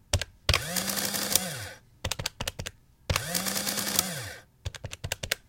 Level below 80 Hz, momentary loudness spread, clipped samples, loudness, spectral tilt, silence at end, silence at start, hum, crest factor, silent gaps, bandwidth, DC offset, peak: -44 dBFS; 15 LU; under 0.1%; -29 LUFS; -2 dB/octave; 0.1 s; 0.15 s; none; 30 dB; none; 17 kHz; under 0.1%; -2 dBFS